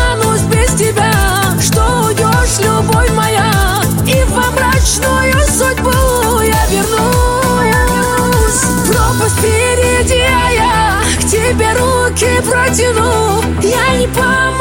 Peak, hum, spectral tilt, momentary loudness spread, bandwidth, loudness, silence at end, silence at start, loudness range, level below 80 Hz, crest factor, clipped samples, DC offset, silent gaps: 0 dBFS; none; -4 dB/octave; 1 LU; 17 kHz; -11 LUFS; 0 s; 0 s; 0 LU; -20 dBFS; 10 dB; under 0.1%; under 0.1%; none